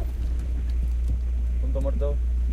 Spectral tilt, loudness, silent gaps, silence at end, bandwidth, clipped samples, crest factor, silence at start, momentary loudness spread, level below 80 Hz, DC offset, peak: -8.5 dB/octave; -27 LUFS; none; 0 s; 4 kHz; under 0.1%; 10 dB; 0 s; 3 LU; -24 dBFS; under 0.1%; -14 dBFS